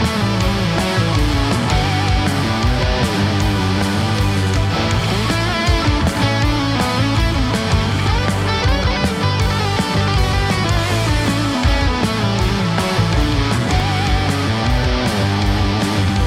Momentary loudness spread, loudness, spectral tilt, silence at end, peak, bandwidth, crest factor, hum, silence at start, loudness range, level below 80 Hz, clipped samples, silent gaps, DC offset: 1 LU; -17 LUFS; -5.5 dB/octave; 0 s; -2 dBFS; 15.5 kHz; 14 dB; none; 0 s; 0 LU; -24 dBFS; under 0.1%; none; under 0.1%